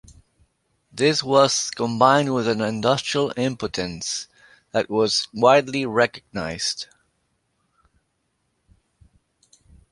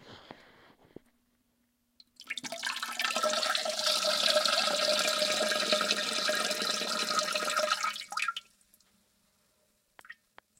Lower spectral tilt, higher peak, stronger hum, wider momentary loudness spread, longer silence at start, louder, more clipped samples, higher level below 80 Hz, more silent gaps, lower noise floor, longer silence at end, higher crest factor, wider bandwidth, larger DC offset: first, -3.5 dB/octave vs 0 dB/octave; first, -2 dBFS vs -10 dBFS; neither; first, 13 LU vs 9 LU; first, 0.95 s vs 0.05 s; first, -21 LUFS vs -29 LUFS; neither; first, -56 dBFS vs -80 dBFS; neither; about the same, -72 dBFS vs -75 dBFS; first, 3.05 s vs 0.45 s; about the same, 22 dB vs 22 dB; second, 11.5 kHz vs 17 kHz; neither